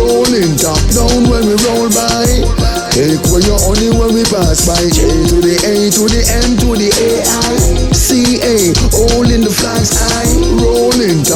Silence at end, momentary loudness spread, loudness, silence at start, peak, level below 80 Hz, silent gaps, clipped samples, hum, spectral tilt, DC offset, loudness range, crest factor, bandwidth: 0 s; 2 LU; -10 LUFS; 0 s; 0 dBFS; -16 dBFS; none; under 0.1%; none; -4 dB/octave; under 0.1%; 1 LU; 10 dB; 19 kHz